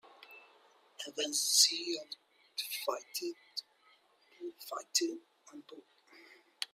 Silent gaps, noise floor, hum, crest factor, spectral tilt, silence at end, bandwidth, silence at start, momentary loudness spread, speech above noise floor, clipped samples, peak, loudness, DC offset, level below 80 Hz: none; -68 dBFS; none; 28 dB; 1.5 dB/octave; 0.1 s; 16 kHz; 0.1 s; 27 LU; 32 dB; under 0.1%; -10 dBFS; -33 LUFS; under 0.1%; under -90 dBFS